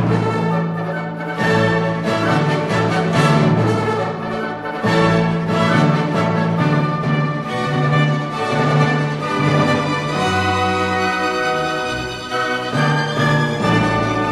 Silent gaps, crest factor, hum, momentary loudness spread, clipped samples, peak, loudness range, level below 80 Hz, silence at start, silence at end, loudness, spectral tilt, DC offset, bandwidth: none; 16 dB; none; 6 LU; under 0.1%; -2 dBFS; 1 LU; -46 dBFS; 0 s; 0 s; -17 LUFS; -6.5 dB/octave; under 0.1%; 12 kHz